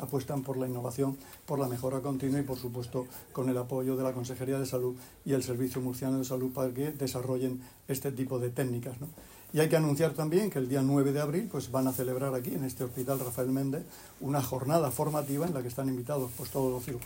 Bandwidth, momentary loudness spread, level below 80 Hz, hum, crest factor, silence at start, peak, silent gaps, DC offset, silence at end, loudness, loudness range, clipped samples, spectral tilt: 16.5 kHz; 9 LU; -62 dBFS; none; 20 dB; 0 s; -12 dBFS; none; under 0.1%; 0 s; -32 LUFS; 4 LU; under 0.1%; -6.5 dB/octave